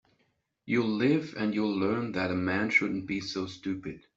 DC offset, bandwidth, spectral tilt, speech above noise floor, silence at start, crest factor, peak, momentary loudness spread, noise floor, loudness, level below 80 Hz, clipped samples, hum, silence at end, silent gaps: under 0.1%; 7.8 kHz; -6 dB/octave; 45 dB; 0.65 s; 20 dB; -10 dBFS; 10 LU; -74 dBFS; -29 LUFS; -64 dBFS; under 0.1%; none; 0.2 s; none